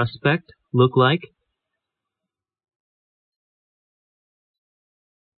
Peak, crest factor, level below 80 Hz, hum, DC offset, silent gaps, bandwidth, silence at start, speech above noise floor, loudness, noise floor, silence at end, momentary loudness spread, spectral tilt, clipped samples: -4 dBFS; 22 dB; -64 dBFS; none; under 0.1%; none; 4.7 kHz; 0 s; 67 dB; -20 LUFS; -86 dBFS; 4.1 s; 9 LU; -11 dB/octave; under 0.1%